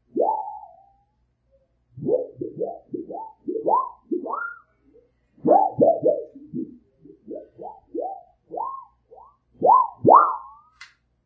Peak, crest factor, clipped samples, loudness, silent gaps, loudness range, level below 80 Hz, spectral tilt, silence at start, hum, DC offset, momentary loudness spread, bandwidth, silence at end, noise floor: 0 dBFS; 24 dB; under 0.1%; -22 LUFS; none; 10 LU; -66 dBFS; -10 dB/octave; 0.15 s; none; under 0.1%; 22 LU; 6.4 kHz; 0.4 s; -68 dBFS